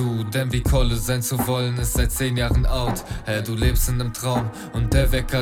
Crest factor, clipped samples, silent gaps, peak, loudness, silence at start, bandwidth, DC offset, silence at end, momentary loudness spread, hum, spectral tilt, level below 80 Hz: 16 dB; under 0.1%; none; -6 dBFS; -23 LUFS; 0 s; 17.5 kHz; under 0.1%; 0 s; 5 LU; none; -5 dB/octave; -26 dBFS